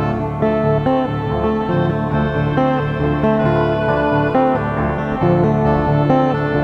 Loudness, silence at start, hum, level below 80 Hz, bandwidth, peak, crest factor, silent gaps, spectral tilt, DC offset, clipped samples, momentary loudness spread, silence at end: -17 LUFS; 0 s; none; -32 dBFS; 6 kHz; -2 dBFS; 14 dB; none; -9.5 dB/octave; under 0.1%; under 0.1%; 4 LU; 0 s